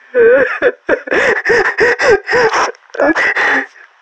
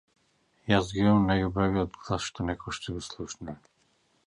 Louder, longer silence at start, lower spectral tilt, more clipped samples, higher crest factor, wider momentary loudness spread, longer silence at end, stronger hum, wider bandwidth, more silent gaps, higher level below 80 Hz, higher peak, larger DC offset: first, -12 LUFS vs -28 LUFS; second, 0.15 s vs 0.65 s; second, -3.5 dB/octave vs -6 dB/octave; neither; second, 12 dB vs 20 dB; second, 6 LU vs 17 LU; second, 0.35 s vs 0.7 s; neither; second, 8.6 kHz vs 11 kHz; neither; about the same, -46 dBFS vs -48 dBFS; first, 0 dBFS vs -8 dBFS; neither